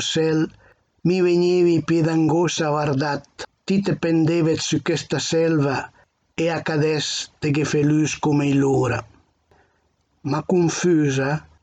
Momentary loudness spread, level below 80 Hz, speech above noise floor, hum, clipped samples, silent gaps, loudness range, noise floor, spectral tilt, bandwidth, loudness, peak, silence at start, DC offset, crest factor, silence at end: 8 LU; -56 dBFS; 46 dB; none; under 0.1%; none; 2 LU; -66 dBFS; -5.5 dB/octave; 9 kHz; -20 LUFS; -8 dBFS; 0 s; under 0.1%; 12 dB; 0.2 s